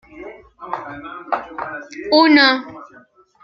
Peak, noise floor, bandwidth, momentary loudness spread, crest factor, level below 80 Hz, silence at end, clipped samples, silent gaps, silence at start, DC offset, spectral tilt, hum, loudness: 0 dBFS; -49 dBFS; 6.4 kHz; 26 LU; 18 dB; -58 dBFS; 0.6 s; under 0.1%; none; 0.15 s; under 0.1%; -4 dB/octave; none; -15 LUFS